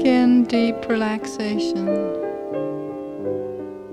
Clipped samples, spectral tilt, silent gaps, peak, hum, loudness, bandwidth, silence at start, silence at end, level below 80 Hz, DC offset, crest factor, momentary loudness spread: under 0.1%; -6 dB/octave; none; -6 dBFS; none; -22 LUFS; 10.5 kHz; 0 s; 0 s; -58 dBFS; under 0.1%; 14 dB; 13 LU